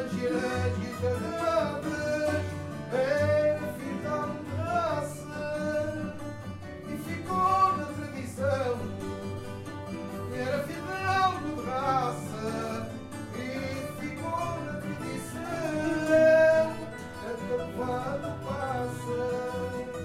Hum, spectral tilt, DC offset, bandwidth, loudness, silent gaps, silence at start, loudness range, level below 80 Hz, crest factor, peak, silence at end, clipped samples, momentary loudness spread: none; -6 dB/octave; under 0.1%; 16 kHz; -30 LUFS; none; 0 s; 7 LU; -56 dBFS; 18 dB; -12 dBFS; 0 s; under 0.1%; 12 LU